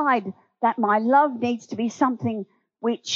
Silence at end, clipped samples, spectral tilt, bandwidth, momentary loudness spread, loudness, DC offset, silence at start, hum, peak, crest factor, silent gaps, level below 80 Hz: 0 s; under 0.1%; -5 dB/octave; 7.4 kHz; 12 LU; -23 LUFS; under 0.1%; 0 s; none; -6 dBFS; 16 dB; none; -82 dBFS